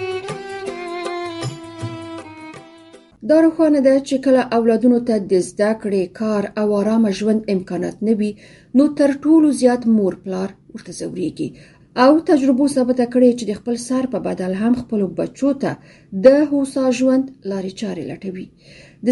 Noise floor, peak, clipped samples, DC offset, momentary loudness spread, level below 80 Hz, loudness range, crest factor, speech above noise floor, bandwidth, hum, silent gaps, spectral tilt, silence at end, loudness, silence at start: -45 dBFS; 0 dBFS; under 0.1%; under 0.1%; 16 LU; -56 dBFS; 3 LU; 18 dB; 28 dB; 11.5 kHz; none; none; -6 dB/octave; 0 s; -18 LUFS; 0 s